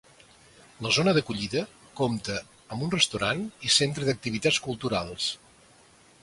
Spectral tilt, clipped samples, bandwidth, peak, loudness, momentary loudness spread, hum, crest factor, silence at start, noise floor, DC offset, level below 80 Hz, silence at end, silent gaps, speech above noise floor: -3.5 dB/octave; under 0.1%; 11.5 kHz; -6 dBFS; -26 LUFS; 12 LU; none; 22 dB; 0.8 s; -57 dBFS; under 0.1%; -56 dBFS; 0.85 s; none; 30 dB